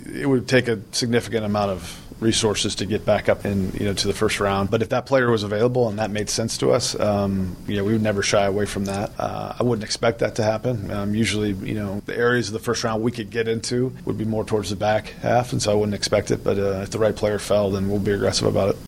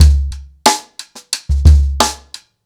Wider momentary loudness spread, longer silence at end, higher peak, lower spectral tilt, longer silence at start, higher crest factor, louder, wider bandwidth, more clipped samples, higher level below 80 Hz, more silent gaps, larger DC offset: second, 6 LU vs 21 LU; second, 0 s vs 0.5 s; second, -4 dBFS vs 0 dBFS; about the same, -5 dB/octave vs -4 dB/octave; about the same, 0 s vs 0 s; about the same, 18 dB vs 14 dB; second, -22 LUFS vs -14 LUFS; about the same, 16.5 kHz vs 16.5 kHz; neither; second, -44 dBFS vs -14 dBFS; neither; neither